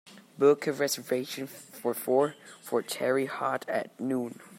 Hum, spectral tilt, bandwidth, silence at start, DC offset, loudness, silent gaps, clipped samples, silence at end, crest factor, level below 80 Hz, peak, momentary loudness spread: none; -4 dB/octave; 16 kHz; 0.05 s; under 0.1%; -29 LUFS; none; under 0.1%; 0 s; 20 dB; -82 dBFS; -10 dBFS; 11 LU